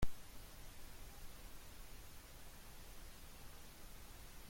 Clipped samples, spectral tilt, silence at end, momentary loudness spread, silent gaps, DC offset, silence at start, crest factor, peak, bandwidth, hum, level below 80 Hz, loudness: under 0.1%; -4 dB/octave; 0 s; 1 LU; none; under 0.1%; 0 s; 22 dB; -24 dBFS; 16.5 kHz; none; -54 dBFS; -57 LUFS